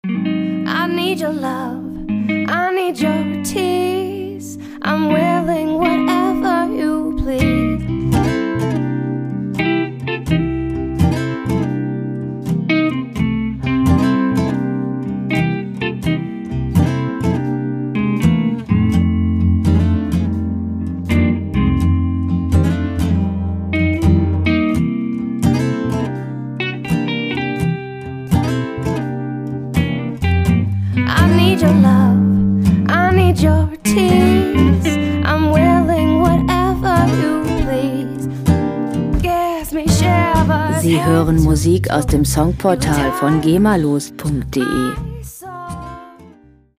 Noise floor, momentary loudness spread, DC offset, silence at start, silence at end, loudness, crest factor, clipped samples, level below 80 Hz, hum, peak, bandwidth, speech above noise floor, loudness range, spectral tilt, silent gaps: -46 dBFS; 9 LU; under 0.1%; 0.05 s; 0.5 s; -16 LUFS; 16 dB; under 0.1%; -30 dBFS; none; 0 dBFS; 16 kHz; 30 dB; 6 LU; -6.5 dB/octave; none